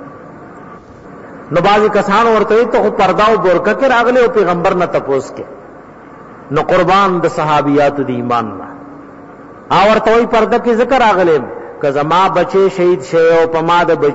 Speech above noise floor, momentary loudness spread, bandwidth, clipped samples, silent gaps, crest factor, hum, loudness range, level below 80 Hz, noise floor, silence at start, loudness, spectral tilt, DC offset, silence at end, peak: 24 dB; 9 LU; 8 kHz; under 0.1%; none; 10 dB; none; 3 LU; -42 dBFS; -35 dBFS; 0 s; -11 LUFS; -6 dB/octave; under 0.1%; 0 s; -2 dBFS